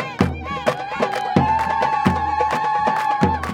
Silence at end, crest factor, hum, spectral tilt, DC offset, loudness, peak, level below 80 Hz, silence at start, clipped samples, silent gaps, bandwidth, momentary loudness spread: 0 s; 18 dB; none; -6 dB/octave; under 0.1%; -20 LUFS; -2 dBFS; -42 dBFS; 0 s; under 0.1%; none; 17 kHz; 5 LU